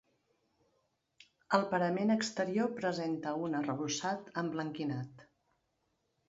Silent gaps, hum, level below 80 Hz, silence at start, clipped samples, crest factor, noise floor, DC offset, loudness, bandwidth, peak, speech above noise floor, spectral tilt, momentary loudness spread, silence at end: none; none; -78 dBFS; 1.5 s; under 0.1%; 24 dB; -80 dBFS; under 0.1%; -35 LUFS; 7.6 kHz; -12 dBFS; 46 dB; -4.5 dB/octave; 7 LU; 1.05 s